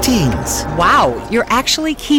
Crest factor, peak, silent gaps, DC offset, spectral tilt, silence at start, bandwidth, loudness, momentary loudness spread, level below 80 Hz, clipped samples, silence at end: 12 dB; -2 dBFS; none; under 0.1%; -4 dB/octave; 0 s; 19.5 kHz; -14 LUFS; 7 LU; -30 dBFS; under 0.1%; 0 s